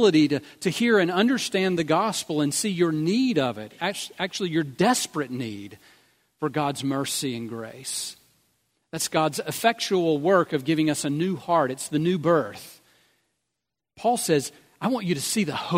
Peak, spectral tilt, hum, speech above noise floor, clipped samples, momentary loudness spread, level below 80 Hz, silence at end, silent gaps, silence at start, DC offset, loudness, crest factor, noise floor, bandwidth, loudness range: -4 dBFS; -4.5 dB/octave; none; 60 dB; under 0.1%; 10 LU; -68 dBFS; 0 s; none; 0 s; under 0.1%; -24 LUFS; 22 dB; -84 dBFS; 16 kHz; 6 LU